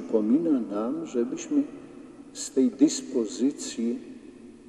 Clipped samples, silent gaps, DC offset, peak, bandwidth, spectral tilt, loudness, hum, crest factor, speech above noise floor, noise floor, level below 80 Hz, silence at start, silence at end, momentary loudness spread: under 0.1%; none; under 0.1%; -8 dBFS; 11.5 kHz; -4.5 dB/octave; -27 LUFS; none; 20 dB; 21 dB; -47 dBFS; -68 dBFS; 0 s; 0.05 s; 21 LU